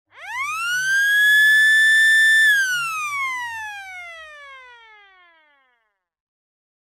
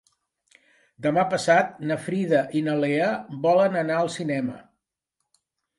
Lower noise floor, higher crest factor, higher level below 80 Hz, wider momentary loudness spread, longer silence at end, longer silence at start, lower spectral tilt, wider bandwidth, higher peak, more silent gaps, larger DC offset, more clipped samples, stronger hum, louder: second, -70 dBFS vs -81 dBFS; second, 12 dB vs 18 dB; about the same, -74 dBFS vs -70 dBFS; first, 20 LU vs 9 LU; first, 2.3 s vs 1.15 s; second, 0.2 s vs 1 s; second, 3 dB/octave vs -6 dB/octave; first, 17 kHz vs 11.5 kHz; about the same, -8 dBFS vs -6 dBFS; neither; neither; neither; neither; first, -15 LUFS vs -23 LUFS